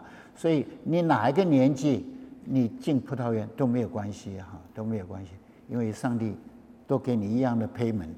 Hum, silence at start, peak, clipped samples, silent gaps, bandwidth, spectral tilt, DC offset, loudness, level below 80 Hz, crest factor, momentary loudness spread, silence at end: none; 0 s; -10 dBFS; under 0.1%; none; 10.5 kHz; -8 dB/octave; under 0.1%; -28 LUFS; -64 dBFS; 18 dB; 18 LU; 0 s